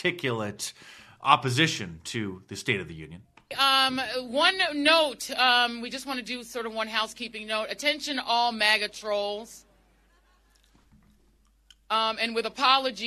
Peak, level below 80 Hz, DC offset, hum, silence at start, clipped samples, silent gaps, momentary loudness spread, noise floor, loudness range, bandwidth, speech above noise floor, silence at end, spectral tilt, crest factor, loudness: -2 dBFS; -64 dBFS; under 0.1%; none; 0 s; under 0.1%; none; 14 LU; -63 dBFS; 7 LU; 13 kHz; 36 dB; 0 s; -3 dB/octave; 26 dB; -25 LUFS